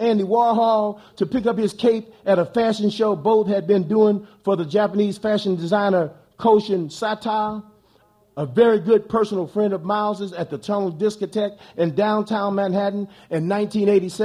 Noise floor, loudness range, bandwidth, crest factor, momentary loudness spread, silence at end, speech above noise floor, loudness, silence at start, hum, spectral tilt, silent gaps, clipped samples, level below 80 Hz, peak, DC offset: -58 dBFS; 3 LU; 11.5 kHz; 16 dB; 8 LU; 0 s; 38 dB; -21 LUFS; 0 s; none; -7 dB/octave; none; under 0.1%; -62 dBFS; -4 dBFS; under 0.1%